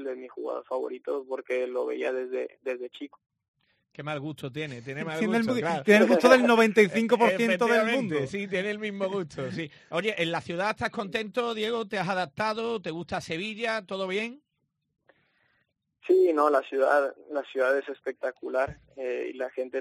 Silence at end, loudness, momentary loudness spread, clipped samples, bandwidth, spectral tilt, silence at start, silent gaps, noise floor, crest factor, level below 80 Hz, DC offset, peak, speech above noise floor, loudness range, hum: 0 s; -27 LUFS; 15 LU; under 0.1%; 13 kHz; -5 dB/octave; 0 s; 3.48-3.54 s; -79 dBFS; 22 dB; -68 dBFS; under 0.1%; -6 dBFS; 52 dB; 12 LU; none